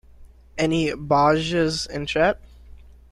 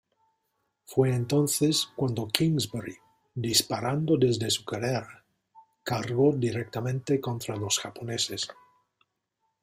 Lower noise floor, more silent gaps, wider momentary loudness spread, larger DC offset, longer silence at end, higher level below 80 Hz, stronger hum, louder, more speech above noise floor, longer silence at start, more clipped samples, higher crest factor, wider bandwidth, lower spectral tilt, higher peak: second, -47 dBFS vs -79 dBFS; neither; about the same, 8 LU vs 10 LU; neither; second, 0.4 s vs 1.1 s; first, -44 dBFS vs -62 dBFS; neither; first, -21 LUFS vs -27 LUFS; second, 26 dB vs 52 dB; second, 0.2 s vs 0.9 s; neither; second, 18 dB vs 28 dB; second, 12.5 kHz vs 16 kHz; about the same, -5 dB/octave vs -4.5 dB/octave; second, -6 dBFS vs 0 dBFS